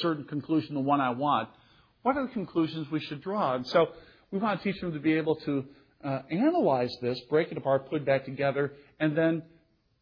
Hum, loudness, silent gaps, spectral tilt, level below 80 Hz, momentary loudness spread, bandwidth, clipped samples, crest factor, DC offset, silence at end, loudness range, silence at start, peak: none; -29 LUFS; none; -8 dB/octave; -66 dBFS; 8 LU; 5.4 kHz; under 0.1%; 18 dB; under 0.1%; 0.6 s; 2 LU; 0 s; -12 dBFS